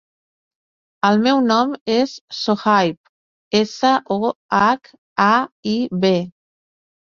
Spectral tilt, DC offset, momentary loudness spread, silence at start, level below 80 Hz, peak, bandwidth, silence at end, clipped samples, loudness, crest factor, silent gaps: -5.5 dB/octave; under 0.1%; 7 LU; 1.05 s; -62 dBFS; -2 dBFS; 7.4 kHz; 0.75 s; under 0.1%; -18 LUFS; 18 dB; 1.81-1.86 s, 2.21-2.28 s, 2.97-3.51 s, 4.36-4.49 s, 4.98-5.16 s, 5.52-5.63 s